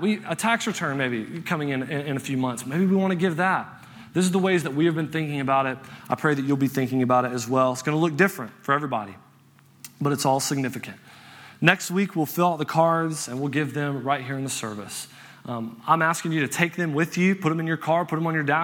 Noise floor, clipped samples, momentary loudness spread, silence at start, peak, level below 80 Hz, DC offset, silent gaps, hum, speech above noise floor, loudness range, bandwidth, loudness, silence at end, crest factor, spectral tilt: -55 dBFS; under 0.1%; 11 LU; 0 s; 0 dBFS; -70 dBFS; under 0.1%; none; none; 31 dB; 3 LU; 19.5 kHz; -24 LUFS; 0 s; 24 dB; -5 dB/octave